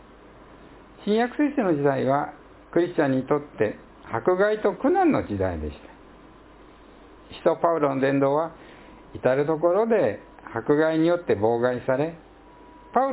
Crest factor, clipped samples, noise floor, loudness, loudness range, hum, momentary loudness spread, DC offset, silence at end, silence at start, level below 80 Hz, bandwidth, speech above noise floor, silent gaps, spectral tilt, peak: 18 dB; under 0.1%; -49 dBFS; -24 LUFS; 3 LU; none; 12 LU; under 0.1%; 0 s; 1 s; -50 dBFS; 4 kHz; 26 dB; none; -11 dB/octave; -6 dBFS